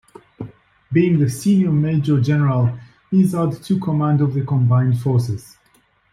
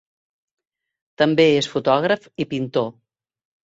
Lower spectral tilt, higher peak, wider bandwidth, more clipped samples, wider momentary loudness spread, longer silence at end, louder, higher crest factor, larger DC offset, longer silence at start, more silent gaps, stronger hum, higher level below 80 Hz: first, -8.5 dB/octave vs -5.5 dB/octave; about the same, -4 dBFS vs -2 dBFS; first, 14.5 kHz vs 8 kHz; neither; first, 14 LU vs 10 LU; about the same, 0.7 s vs 0.8 s; about the same, -18 LUFS vs -20 LUFS; second, 14 dB vs 20 dB; neither; second, 0.4 s vs 1.2 s; neither; neither; first, -52 dBFS vs -64 dBFS